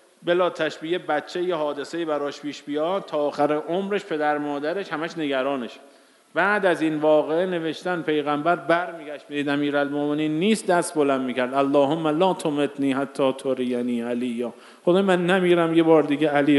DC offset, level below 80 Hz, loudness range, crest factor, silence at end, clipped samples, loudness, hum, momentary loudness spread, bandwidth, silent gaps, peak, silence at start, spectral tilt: under 0.1%; -76 dBFS; 4 LU; 18 dB; 0 s; under 0.1%; -23 LUFS; none; 9 LU; 11.5 kHz; none; -6 dBFS; 0.2 s; -5.5 dB/octave